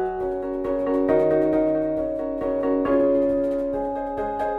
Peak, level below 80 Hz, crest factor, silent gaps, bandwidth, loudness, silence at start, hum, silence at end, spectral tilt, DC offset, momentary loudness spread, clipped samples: -6 dBFS; -46 dBFS; 16 dB; none; 4.8 kHz; -23 LUFS; 0 s; none; 0 s; -9 dB/octave; under 0.1%; 8 LU; under 0.1%